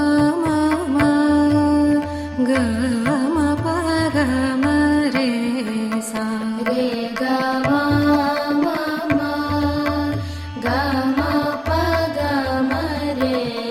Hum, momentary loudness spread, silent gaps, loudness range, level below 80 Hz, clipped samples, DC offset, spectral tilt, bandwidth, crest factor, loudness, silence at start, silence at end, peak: none; 6 LU; none; 3 LU; -40 dBFS; under 0.1%; under 0.1%; -6 dB/octave; 15 kHz; 14 dB; -19 LUFS; 0 s; 0 s; -6 dBFS